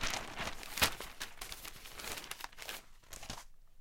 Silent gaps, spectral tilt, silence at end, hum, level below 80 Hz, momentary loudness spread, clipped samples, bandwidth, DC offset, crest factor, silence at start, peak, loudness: none; -1 dB/octave; 0 s; none; -52 dBFS; 16 LU; under 0.1%; 17 kHz; under 0.1%; 30 dB; 0 s; -12 dBFS; -40 LUFS